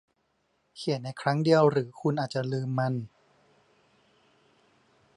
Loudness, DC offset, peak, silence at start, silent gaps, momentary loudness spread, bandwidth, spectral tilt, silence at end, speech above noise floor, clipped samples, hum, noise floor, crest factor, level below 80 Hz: -28 LUFS; under 0.1%; -8 dBFS; 0.75 s; none; 12 LU; 11 kHz; -7 dB/octave; 2.1 s; 47 dB; under 0.1%; none; -73 dBFS; 22 dB; -74 dBFS